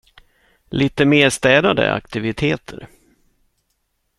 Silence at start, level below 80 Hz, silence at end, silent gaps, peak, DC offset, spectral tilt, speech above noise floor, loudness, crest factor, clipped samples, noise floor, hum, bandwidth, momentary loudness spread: 0.7 s; -46 dBFS; 1.35 s; none; 0 dBFS; under 0.1%; -5 dB/octave; 52 dB; -17 LUFS; 20 dB; under 0.1%; -69 dBFS; none; 13 kHz; 14 LU